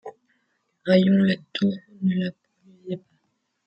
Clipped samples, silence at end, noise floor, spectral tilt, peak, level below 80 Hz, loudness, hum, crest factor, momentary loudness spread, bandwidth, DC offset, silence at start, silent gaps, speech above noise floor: under 0.1%; 0.7 s; -73 dBFS; -8.5 dB/octave; -6 dBFS; -68 dBFS; -23 LUFS; none; 18 dB; 17 LU; 5.8 kHz; under 0.1%; 0.05 s; none; 52 dB